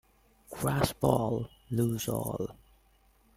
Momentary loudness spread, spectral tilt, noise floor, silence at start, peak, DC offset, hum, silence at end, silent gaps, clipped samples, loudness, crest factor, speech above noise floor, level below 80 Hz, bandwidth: 10 LU; -6 dB/octave; -65 dBFS; 0.5 s; -10 dBFS; under 0.1%; none; 0.85 s; none; under 0.1%; -31 LUFS; 24 dB; 35 dB; -54 dBFS; 16.5 kHz